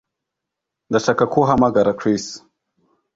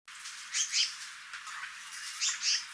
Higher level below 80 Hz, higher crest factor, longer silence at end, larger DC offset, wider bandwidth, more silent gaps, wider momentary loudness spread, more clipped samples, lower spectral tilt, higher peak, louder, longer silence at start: first, -50 dBFS vs -84 dBFS; about the same, 18 dB vs 20 dB; first, 0.75 s vs 0 s; neither; second, 7.8 kHz vs 11 kHz; neither; second, 11 LU vs 14 LU; neither; first, -6 dB/octave vs 6 dB/octave; first, -2 dBFS vs -16 dBFS; first, -18 LUFS vs -33 LUFS; first, 0.9 s vs 0.05 s